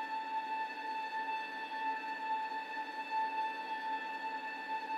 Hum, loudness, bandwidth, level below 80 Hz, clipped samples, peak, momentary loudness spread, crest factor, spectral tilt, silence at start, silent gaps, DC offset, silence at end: 50 Hz at -75 dBFS; -39 LUFS; 13 kHz; under -90 dBFS; under 0.1%; -26 dBFS; 3 LU; 12 dB; -2 dB/octave; 0 s; none; under 0.1%; 0 s